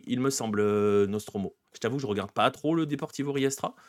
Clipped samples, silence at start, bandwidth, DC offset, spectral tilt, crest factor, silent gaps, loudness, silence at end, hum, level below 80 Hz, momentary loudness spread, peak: under 0.1%; 0.05 s; 15 kHz; under 0.1%; -5 dB/octave; 20 dB; none; -28 LUFS; 0.15 s; none; -72 dBFS; 9 LU; -8 dBFS